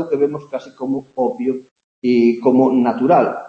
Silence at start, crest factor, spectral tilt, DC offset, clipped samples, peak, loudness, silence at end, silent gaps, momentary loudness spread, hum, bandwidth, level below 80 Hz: 0 s; 16 dB; -8.5 dB/octave; under 0.1%; under 0.1%; -2 dBFS; -17 LUFS; 0 s; 1.71-1.76 s, 1.84-2.02 s; 13 LU; none; 6.8 kHz; -66 dBFS